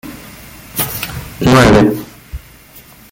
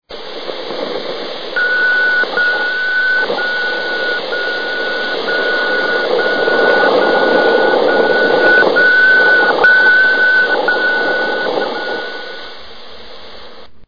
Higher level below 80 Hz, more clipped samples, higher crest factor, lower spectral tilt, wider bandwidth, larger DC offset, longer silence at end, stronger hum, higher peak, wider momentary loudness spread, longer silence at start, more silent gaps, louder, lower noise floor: first, -32 dBFS vs -56 dBFS; neither; about the same, 14 dB vs 12 dB; first, -5.5 dB/octave vs -4 dB/octave; first, 17 kHz vs 5.4 kHz; second, under 0.1% vs 3%; first, 0.35 s vs 0 s; neither; about the same, 0 dBFS vs -2 dBFS; first, 25 LU vs 14 LU; about the same, 0.05 s vs 0 s; neither; about the same, -12 LUFS vs -12 LUFS; about the same, -40 dBFS vs -37 dBFS